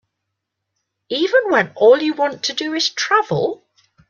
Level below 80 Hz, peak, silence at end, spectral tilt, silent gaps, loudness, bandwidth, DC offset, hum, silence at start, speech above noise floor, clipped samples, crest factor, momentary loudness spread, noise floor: -66 dBFS; -2 dBFS; 0.55 s; -3.5 dB/octave; none; -17 LUFS; 7.4 kHz; under 0.1%; none; 1.1 s; 61 dB; under 0.1%; 16 dB; 9 LU; -78 dBFS